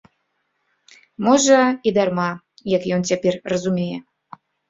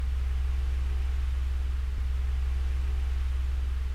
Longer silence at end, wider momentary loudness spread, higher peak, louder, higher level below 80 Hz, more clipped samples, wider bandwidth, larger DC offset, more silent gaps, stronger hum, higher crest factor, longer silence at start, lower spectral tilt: first, 0.7 s vs 0 s; first, 12 LU vs 1 LU; first, -2 dBFS vs -20 dBFS; first, -19 LUFS vs -31 LUFS; second, -60 dBFS vs -28 dBFS; neither; first, 7.8 kHz vs 6.6 kHz; neither; neither; neither; first, 18 dB vs 8 dB; first, 1.2 s vs 0 s; second, -4.5 dB/octave vs -6 dB/octave